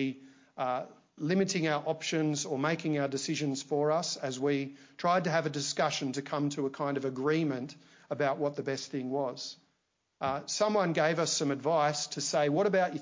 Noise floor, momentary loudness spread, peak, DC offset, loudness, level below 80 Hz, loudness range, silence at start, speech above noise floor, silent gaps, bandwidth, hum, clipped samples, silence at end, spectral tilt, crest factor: -78 dBFS; 9 LU; -14 dBFS; under 0.1%; -31 LUFS; -76 dBFS; 3 LU; 0 s; 47 dB; none; 7.8 kHz; none; under 0.1%; 0 s; -4.5 dB/octave; 18 dB